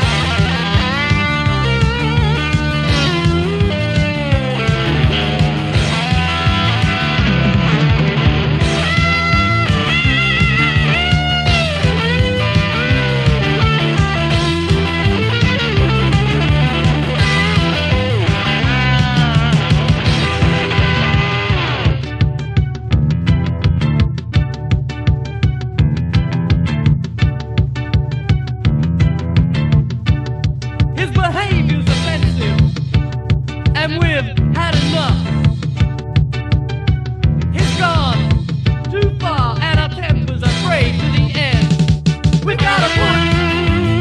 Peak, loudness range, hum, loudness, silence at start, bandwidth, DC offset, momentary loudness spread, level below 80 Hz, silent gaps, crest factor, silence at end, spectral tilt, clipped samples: -2 dBFS; 3 LU; none; -15 LUFS; 0 s; 10.5 kHz; under 0.1%; 5 LU; -24 dBFS; none; 14 dB; 0 s; -6 dB/octave; under 0.1%